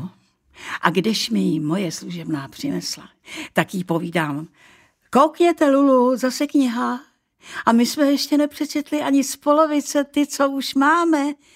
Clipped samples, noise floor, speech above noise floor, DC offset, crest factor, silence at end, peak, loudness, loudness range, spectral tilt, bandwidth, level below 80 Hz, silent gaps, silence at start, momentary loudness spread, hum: under 0.1%; -53 dBFS; 34 dB; under 0.1%; 20 dB; 0.2 s; 0 dBFS; -20 LUFS; 6 LU; -4.5 dB/octave; 16 kHz; -66 dBFS; none; 0 s; 13 LU; none